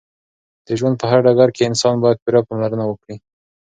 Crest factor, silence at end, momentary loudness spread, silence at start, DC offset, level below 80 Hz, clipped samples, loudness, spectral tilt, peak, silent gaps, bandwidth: 18 dB; 0.6 s; 14 LU; 0.7 s; under 0.1%; -58 dBFS; under 0.1%; -16 LUFS; -6 dB/octave; 0 dBFS; 2.22-2.26 s; 9.4 kHz